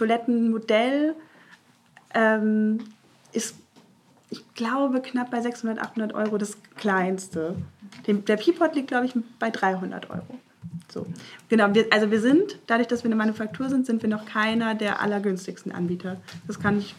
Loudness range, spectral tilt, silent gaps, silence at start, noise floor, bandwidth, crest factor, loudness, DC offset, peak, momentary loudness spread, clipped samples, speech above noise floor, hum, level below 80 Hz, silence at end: 5 LU; -5.5 dB/octave; none; 0 s; -58 dBFS; 13 kHz; 24 dB; -25 LUFS; under 0.1%; -2 dBFS; 16 LU; under 0.1%; 33 dB; none; -70 dBFS; 0.05 s